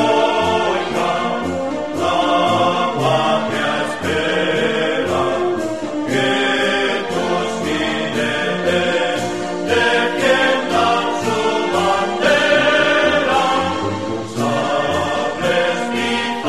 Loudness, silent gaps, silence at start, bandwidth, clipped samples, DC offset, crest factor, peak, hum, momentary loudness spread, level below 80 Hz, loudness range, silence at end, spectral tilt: -17 LUFS; none; 0 s; 13 kHz; under 0.1%; 0.9%; 16 dB; -2 dBFS; none; 6 LU; -50 dBFS; 3 LU; 0 s; -4 dB/octave